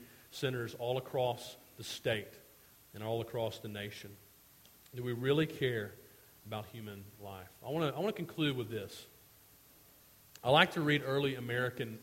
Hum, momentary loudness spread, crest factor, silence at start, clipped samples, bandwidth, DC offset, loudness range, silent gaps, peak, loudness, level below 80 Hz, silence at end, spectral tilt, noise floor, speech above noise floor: none; 18 LU; 28 dB; 0 s; under 0.1%; 16.5 kHz; under 0.1%; 7 LU; none; -10 dBFS; -35 LUFS; -70 dBFS; 0 s; -5.5 dB/octave; -62 dBFS; 26 dB